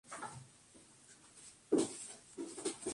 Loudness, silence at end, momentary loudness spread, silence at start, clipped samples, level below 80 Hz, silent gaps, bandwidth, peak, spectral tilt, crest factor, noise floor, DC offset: -41 LUFS; 0 s; 24 LU; 0.05 s; under 0.1%; -76 dBFS; none; 11.5 kHz; -20 dBFS; -3.5 dB/octave; 22 dB; -63 dBFS; under 0.1%